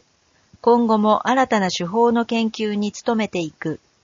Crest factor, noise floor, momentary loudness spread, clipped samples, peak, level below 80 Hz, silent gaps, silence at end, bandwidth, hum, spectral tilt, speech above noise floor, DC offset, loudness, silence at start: 16 dB; -60 dBFS; 9 LU; under 0.1%; -4 dBFS; -62 dBFS; none; 0.3 s; 7.4 kHz; none; -4 dB/octave; 41 dB; under 0.1%; -20 LUFS; 0.65 s